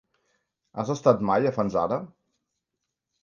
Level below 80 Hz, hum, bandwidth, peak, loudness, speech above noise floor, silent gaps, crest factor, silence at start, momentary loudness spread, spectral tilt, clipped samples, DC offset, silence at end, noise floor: -62 dBFS; none; 7.4 kHz; -4 dBFS; -25 LUFS; 59 dB; none; 22 dB; 0.75 s; 11 LU; -7 dB/octave; under 0.1%; under 0.1%; 1.15 s; -83 dBFS